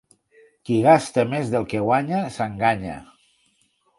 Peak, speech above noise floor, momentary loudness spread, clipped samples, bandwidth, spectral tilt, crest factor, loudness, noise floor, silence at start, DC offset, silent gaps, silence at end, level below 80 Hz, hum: -2 dBFS; 45 dB; 14 LU; under 0.1%; 11.5 kHz; -6.5 dB/octave; 20 dB; -21 LUFS; -65 dBFS; 0.7 s; under 0.1%; none; 0.95 s; -54 dBFS; none